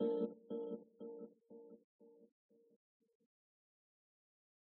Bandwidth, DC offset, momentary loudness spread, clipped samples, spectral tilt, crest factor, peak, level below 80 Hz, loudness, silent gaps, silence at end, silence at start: 4 kHz; under 0.1%; 25 LU; under 0.1%; -8.5 dB/octave; 20 dB; -28 dBFS; under -90 dBFS; -47 LUFS; 1.84-1.99 s; 2.35 s; 0 s